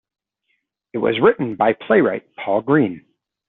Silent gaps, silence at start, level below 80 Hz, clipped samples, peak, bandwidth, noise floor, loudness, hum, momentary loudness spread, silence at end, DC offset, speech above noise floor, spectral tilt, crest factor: none; 0.95 s; -60 dBFS; under 0.1%; -2 dBFS; 4.1 kHz; -71 dBFS; -18 LUFS; none; 10 LU; 0.5 s; under 0.1%; 53 dB; -5 dB/octave; 18 dB